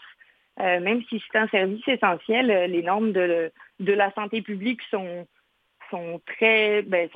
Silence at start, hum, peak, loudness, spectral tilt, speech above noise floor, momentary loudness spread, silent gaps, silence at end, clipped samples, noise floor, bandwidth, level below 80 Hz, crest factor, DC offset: 0 s; none; -4 dBFS; -23 LUFS; -7.5 dB/octave; 31 dB; 13 LU; none; 0.1 s; under 0.1%; -55 dBFS; 4.9 kHz; -76 dBFS; 20 dB; under 0.1%